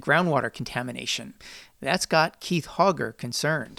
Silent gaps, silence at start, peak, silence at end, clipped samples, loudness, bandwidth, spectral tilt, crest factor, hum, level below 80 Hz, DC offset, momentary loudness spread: none; 0 s; -6 dBFS; 0 s; under 0.1%; -26 LUFS; 17 kHz; -4 dB/octave; 20 dB; none; -58 dBFS; under 0.1%; 11 LU